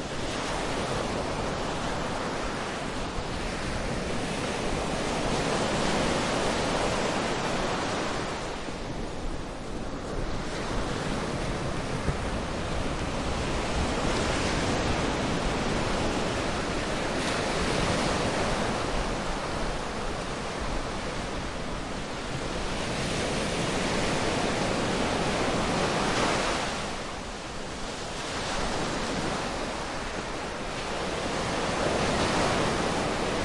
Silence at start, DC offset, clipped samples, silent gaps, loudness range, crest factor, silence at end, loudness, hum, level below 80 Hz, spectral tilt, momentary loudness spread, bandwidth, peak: 0 s; under 0.1%; under 0.1%; none; 5 LU; 16 dB; 0 s; -29 LUFS; none; -38 dBFS; -4 dB/octave; 7 LU; 11.5 kHz; -12 dBFS